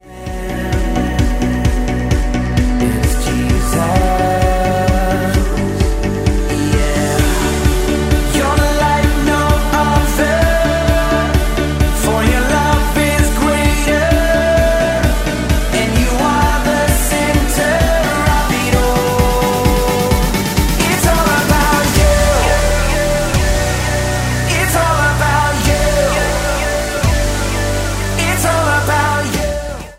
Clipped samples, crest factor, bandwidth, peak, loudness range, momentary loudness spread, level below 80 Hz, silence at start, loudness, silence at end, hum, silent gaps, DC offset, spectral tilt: under 0.1%; 12 dB; 16.5 kHz; 0 dBFS; 2 LU; 4 LU; -18 dBFS; 0.05 s; -14 LUFS; 0.05 s; none; none; under 0.1%; -5 dB/octave